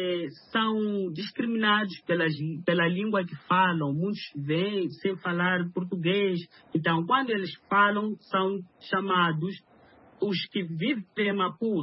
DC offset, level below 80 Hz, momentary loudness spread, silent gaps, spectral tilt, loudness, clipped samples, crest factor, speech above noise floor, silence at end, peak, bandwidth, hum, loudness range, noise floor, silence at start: under 0.1%; -74 dBFS; 8 LU; none; -10 dB/octave; -27 LUFS; under 0.1%; 20 dB; 29 dB; 0 s; -8 dBFS; 5.8 kHz; none; 2 LU; -56 dBFS; 0 s